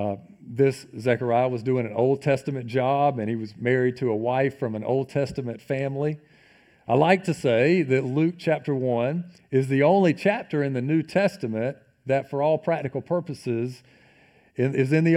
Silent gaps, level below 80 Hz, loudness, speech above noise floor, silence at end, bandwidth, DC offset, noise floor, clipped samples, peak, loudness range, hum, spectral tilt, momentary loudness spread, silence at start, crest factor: none; -64 dBFS; -24 LUFS; 34 dB; 0 s; 13 kHz; under 0.1%; -57 dBFS; under 0.1%; -4 dBFS; 4 LU; none; -7.5 dB/octave; 9 LU; 0 s; 20 dB